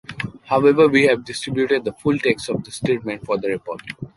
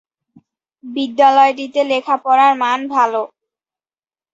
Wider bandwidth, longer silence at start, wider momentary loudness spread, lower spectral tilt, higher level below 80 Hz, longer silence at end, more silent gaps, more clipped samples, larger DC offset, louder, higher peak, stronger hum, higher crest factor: first, 11.5 kHz vs 7.8 kHz; second, 0.1 s vs 0.85 s; first, 15 LU vs 12 LU; first, -5.5 dB/octave vs -3 dB/octave; first, -54 dBFS vs -70 dBFS; second, 0.1 s vs 1.05 s; neither; neither; neither; second, -19 LUFS vs -14 LUFS; about the same, -2 dBFS vs -2 dBFS; neither; about the same, 16 dB vs 16 dB